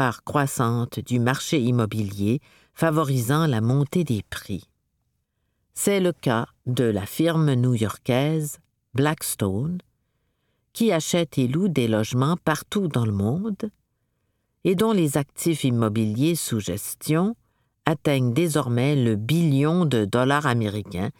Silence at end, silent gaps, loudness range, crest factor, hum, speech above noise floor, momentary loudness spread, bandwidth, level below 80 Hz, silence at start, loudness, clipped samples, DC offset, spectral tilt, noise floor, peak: 0.1 s; none; 3 LU; 22 dB; none; 51 dB; 8 LU; 18.5 kHz; -58 dBFS; 0 s; -23 LUFS; under 0.1%; under 0.1%; -6 dB/octave; -74 dBFS; -2 dBFS